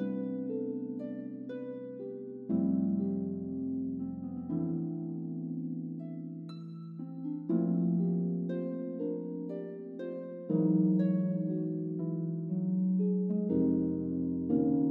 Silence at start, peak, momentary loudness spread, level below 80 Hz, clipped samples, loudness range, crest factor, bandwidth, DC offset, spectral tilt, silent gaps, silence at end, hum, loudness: 0 s; -18 dBFS; 13 LU; -70 dBFS; under 0.1%; 6 LU; 16 dB; 4.2 kHz; under 0.1%; -12 dB/octave; none; 0 s; none; -34 LUFS